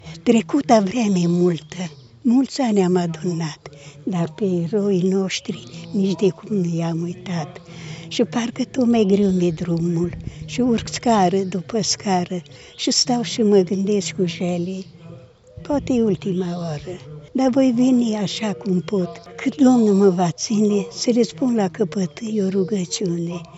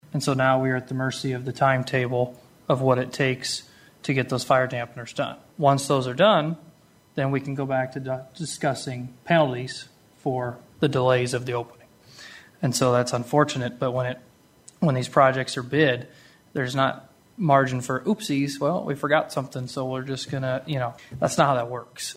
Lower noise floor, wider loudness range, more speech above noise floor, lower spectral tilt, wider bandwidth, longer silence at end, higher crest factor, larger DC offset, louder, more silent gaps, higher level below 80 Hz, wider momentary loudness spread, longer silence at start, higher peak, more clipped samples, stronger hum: second, -42 dBFS vs -54 dBFS; about the same, 4 LU vs 3 LU; second, 23 dB vs 31 dB; about the same, -5.5 dB/octave vs -5.5 dB/octave; second, 8.2 kHz vs 15.5 kHz; about the same, 0 s vs 0.05 s; about the same, 18 dB vs 22 dB; neither; first, -20 LUFS vs -24 LUFS; neither; first, -52 dBFS vs -62 dBFS; about the same, 12 LU vs 12 LU; about the same, 0.05 s vs 0.1 s; about the same, -2 dBFS vs -4 dBFS; neither; neither